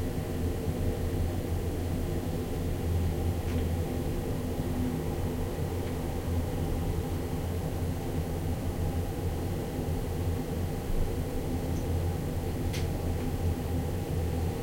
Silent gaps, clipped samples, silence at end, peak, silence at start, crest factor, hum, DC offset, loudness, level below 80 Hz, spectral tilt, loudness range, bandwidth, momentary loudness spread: none; under 0.1%; 0 s; -18 dBFS; 0 s; 12 dB; none; under 0.1%; -33 LUFS; -38 dBFS; -7 dB/octave; 1 LU; 16.5 kHz; 2 LU